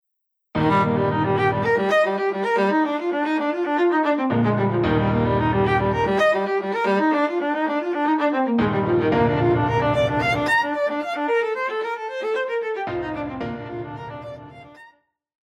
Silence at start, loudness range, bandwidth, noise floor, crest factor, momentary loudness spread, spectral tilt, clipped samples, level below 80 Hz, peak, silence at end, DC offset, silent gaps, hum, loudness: 0.55 s; 6 LU; 12.5 kHz; -77 dBFS; 14 dB; 9 LU; -7.5 dB/octave; under 0.1%; -46 dBFS; -6 dBFS; 0.7 s; under 0.1%; none; none; -21 LUFS